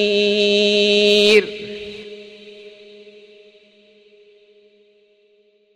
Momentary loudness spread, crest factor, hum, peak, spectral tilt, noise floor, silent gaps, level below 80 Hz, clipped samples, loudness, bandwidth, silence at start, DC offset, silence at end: 25 LU; 18 dB; none; -2 dBFS; -3.5 dB/octave; -57 dBFS; none; -58 dBFS; under 0.1%; -14 LUFS; 12 kHz; 0 s; under 0.1%; 3.05 s